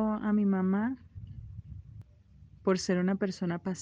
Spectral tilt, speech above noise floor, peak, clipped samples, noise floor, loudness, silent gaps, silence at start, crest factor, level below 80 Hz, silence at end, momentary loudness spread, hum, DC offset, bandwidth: -6.5 dB/octave; 28 dB; -14 dBFS; under 0.1%; -57 dBFS; -30 LUFS; none; 0 s; 16 dB; -56 dBFS; 0 s; 20 LU; none; under 0.1%; 9 kHz